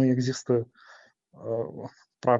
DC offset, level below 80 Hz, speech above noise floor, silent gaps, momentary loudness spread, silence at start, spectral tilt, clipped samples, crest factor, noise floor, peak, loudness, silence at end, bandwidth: under 0.1%; -70 dBFS; 28 dB; none; 17 LU; 0 s; -7 dB/octave; under 0.1%; 20 dB; -55 dBFS; -8 dBFS; -29 LUFS; 0 s; 7.8 kHz